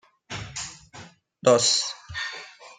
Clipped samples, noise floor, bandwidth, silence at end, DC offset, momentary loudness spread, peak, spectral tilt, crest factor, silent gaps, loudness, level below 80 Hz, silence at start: under 0.1%; -48 dBFS; 9.6 kHz; 0.05 s; under 0.1%; 19 LU; -6 dBFS; -2 dB/octave; 22 dB; none; -24 LUFS; -58 dBFS; 0.3 s